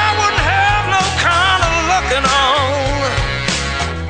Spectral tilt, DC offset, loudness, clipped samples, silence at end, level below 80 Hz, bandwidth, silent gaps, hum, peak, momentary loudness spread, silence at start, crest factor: -3 dB/octave; under 0.1%; -14 LUFS; under 0.1%; 0 s; -26 dBFS; 9.8 kHz; none; none; -2 dBFS; 5 LU; 0 s; 12 dB